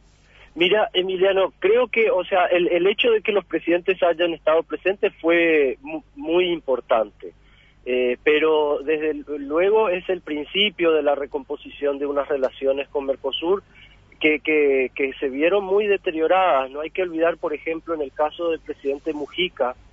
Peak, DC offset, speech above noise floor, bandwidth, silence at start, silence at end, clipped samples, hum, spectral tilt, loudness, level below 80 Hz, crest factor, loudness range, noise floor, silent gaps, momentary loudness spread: -6 dBFS; under 0.1%; 30 dB; 5.8 kHz; 0.55 s; 0.2 s; under 0.1%; 50 Hz at -55 dBFS; -6.5 dB/octave; -21 LUFS; -54 dBFS; 16 dB; 4 LU; -51 dBFS; none; 9 LU